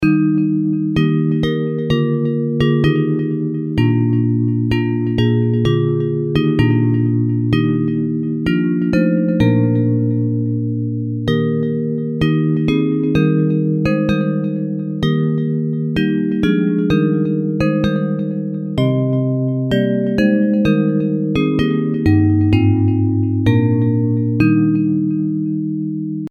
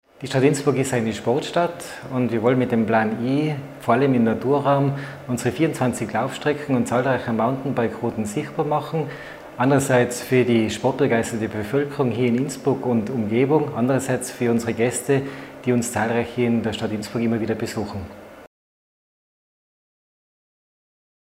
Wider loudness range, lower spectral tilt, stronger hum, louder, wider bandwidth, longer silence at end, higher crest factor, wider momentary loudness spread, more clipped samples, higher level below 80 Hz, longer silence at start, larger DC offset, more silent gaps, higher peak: second, 2 LU vs 5 LU; first, -9 dB/octave vs -6 dB/octave; neither; first, -17 LUFS vs -22 LUFS; second, 7 kHz vs 16 kHz; second, 0 s vs 2.75 s; about the same, 14 dB vs 18 dB; second, 5 LU vs 8 LU; neither; first, -40 dBFS vs -58 dBFS; second, 0 s vs 0.2 s; neither; neither; about the same, -2 dBFS vs -4 dBFS